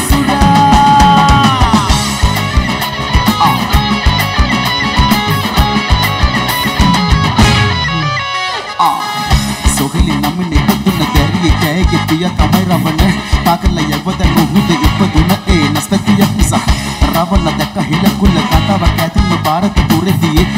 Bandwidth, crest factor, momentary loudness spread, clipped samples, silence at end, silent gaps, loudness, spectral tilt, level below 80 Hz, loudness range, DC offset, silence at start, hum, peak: 16.5 kHz; 10 dB; 5 LU; under 0.1%; 0 s; none; -11 LUFS; -5 dB/octave; -18 dBFS; 2 LU; under 0.1%; 0 s; none; 0 dBFS